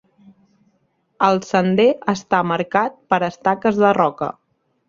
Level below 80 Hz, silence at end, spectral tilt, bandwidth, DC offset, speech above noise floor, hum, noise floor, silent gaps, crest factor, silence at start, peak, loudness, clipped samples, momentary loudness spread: -60 dBFS; 0.6 s; -6 dB/octave; 7.6 kHz; under 0.1%; 48 dB; none; -65 dBFS; none; 18 dB; 1.2 s; 0 dBFS; -18 LUFS; under 0.1%; 5 LU